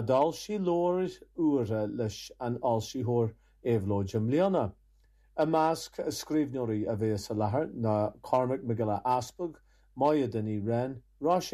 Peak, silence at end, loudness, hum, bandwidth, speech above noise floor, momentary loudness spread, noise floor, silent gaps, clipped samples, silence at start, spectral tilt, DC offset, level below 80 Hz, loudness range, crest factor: -12 dBFS; 0 s; -31 LUFS; none; 14 kHz; 34 dB; 9 LU; -63 dBFS; none; under 0.1%; 0 s; -7 dB/octave; under 0.1%; -62 dBFS; 1 LU; 18 dB